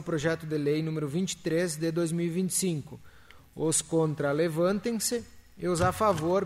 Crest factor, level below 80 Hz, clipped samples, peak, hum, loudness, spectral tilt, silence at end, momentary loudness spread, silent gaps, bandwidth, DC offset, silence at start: 16 dB; -56 dBFS; under 0.1%; -12 dBFS; none; -29 LUFS; -5 dB/octave; 0 s; 6 LU; none; 16 kHz; under 0.1%; 0 s